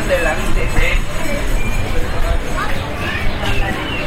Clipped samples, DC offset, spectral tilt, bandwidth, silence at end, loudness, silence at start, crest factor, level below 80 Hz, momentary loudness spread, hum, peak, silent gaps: under 0.1%; under 0.1%; -4.5 dB/octave; 15.5 kHz; 0 s; -20 LUFS; 0 s; 12 dB; -18 dBFS; 4 LU; none; -2 dBFS; none